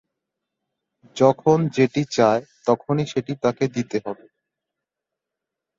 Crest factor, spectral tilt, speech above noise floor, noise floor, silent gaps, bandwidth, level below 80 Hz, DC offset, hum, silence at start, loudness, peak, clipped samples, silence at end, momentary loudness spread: 20 dB; -6.5 dB/octave; 65 dB; -85 dBFS; none; 7.8 kHz; -62 dBFS; under 0.1%; none; 1.15 s; -21 LUFS; -2 dBFS; under 0.1%; 1.65 s; 10 LU